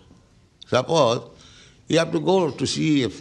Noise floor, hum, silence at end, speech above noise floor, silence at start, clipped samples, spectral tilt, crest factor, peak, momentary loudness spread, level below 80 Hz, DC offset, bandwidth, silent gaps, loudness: -54 dBFS; none; 0 s; 33 dB; 0.7 s; under 0.1%; -5 dB/octave; 18 dB; -4 dBFS; 4 LU; -58 dBFS; under 0.1%; 11.5 kHz; none; -21 LUFS